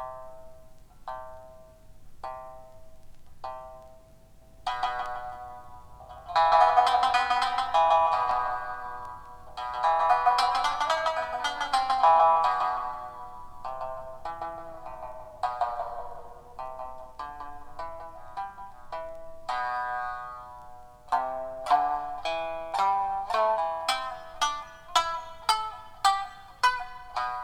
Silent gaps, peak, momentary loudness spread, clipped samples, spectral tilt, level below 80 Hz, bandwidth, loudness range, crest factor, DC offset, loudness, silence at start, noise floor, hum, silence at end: none; -8 dBFS; 21 LU; under 0.1%; -1.5 dB/octave; -54 dBFS; 17.5 kHz; 16 LU; 22 dB; under 0.1%; -27 LUFS; 0 s; -52 dBFS; none; 0 s